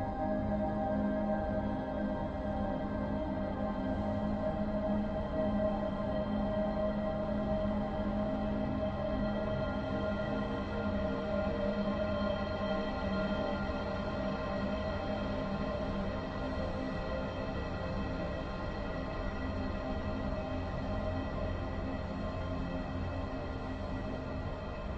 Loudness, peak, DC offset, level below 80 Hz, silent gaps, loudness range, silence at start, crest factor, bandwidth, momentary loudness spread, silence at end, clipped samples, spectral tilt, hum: -36 LUFS; -22 dBFS; under 0.1%; -44 dBFS; none; 4 LU; 0 s; 14 dB; 7.8 kHz; 5 LU; 0 s; under 0.1%; -8.5 dB/octave; none